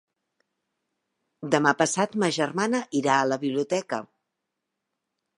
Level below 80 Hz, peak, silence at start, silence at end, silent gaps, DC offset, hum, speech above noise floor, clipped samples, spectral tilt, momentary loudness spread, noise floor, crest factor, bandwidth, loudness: -74 dBFS; -4 dBFS; 1.4 s; 1.35 s; none; under 0.1%; none; 58 dB; under 0.1%; -4 dB/octave; 7 LU; -83 dBFS; 24 dB; 11.5 kHz; -25 LUFS